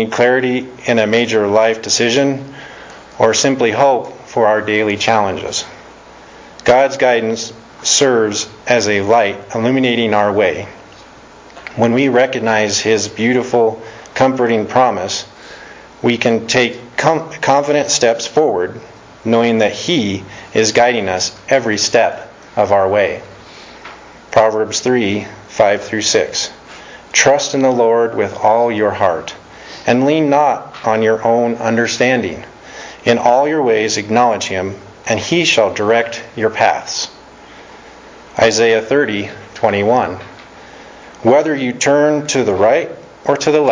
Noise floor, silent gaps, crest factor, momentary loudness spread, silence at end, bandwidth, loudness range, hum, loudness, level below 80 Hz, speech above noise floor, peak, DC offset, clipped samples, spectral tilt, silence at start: -39 dBFS; none; 14 dB; 14 LU; 0 s; 7.6 kHz; 2 LU; none; -14 LUFS; -50 dBFS; 25 dB; 0 dBFS; under 0.1%; under 0.1%; -3.5 dB/octave; 0 s